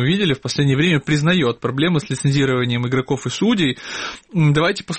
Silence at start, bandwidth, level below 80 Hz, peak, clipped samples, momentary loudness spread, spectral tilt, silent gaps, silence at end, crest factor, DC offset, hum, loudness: 0 s; 8.8 kHz; -50 dBFS; -4 dBFS; under 0.1%; 6 LU; -5.5 dB/octave; none; 0 s; 14 dB; 0.2%; none; -18 LUFS